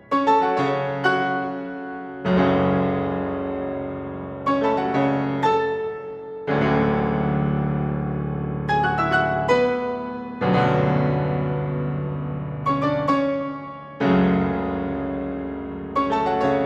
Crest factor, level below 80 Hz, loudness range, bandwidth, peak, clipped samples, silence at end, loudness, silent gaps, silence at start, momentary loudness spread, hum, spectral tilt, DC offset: 16 dB; -44 dBFS; 2 LU; 8 kHz; -6 dBFS; under 0.1%; 0 s; -23 LUFS; none; 0.1 s; 11 LU; none; -8 dB/octave; under 0.1%